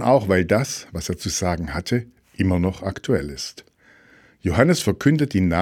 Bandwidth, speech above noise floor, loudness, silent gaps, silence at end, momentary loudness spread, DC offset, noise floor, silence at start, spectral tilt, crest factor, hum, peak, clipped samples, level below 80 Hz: 17 kHz; 33 dB; -22 LUFS; none; 0 s; 11 LU; under 0.1%; -53 dBFS; 0 s; -5.5 dB/octave; 20 dB; none; 0 dBFS; under 0.1%; -42 dBFS